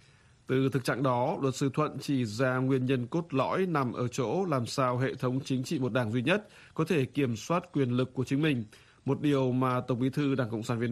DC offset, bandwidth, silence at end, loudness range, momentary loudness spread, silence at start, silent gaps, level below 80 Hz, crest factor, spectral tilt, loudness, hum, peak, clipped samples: under 0.1%; 14 kHz; 0 s; 1 LU; 4 LU; 0.5 s; none; -66 dBFS; 18 dB; -6.5 dB/octave; -30 LUFS; none; -12 dBFS; under 0.1%